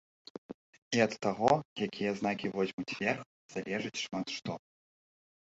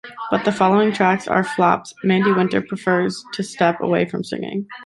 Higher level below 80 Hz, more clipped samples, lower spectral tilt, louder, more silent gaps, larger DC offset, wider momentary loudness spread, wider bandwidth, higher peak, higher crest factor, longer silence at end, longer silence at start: second, -70 dBFS vs -60 dBFS; neither; second, -4.5 dB/octave vs -6 dB/octave; second, -34 LUFS vs -19 LUFS; first, 0.54-0.91 s, 1.65-1.76 s, 2.73-2.78 s, 3.26-3.49 s vs none; neither; first, 19 LU vs 10 LU; second, 8.2 kHz vs 11.5 kHz; second, -10 dBFS vs -2 dBFS; first, 24 dB vs 16 dB; first, 0.85 s vs 0 s; first, 0.5 s vs 0.05 s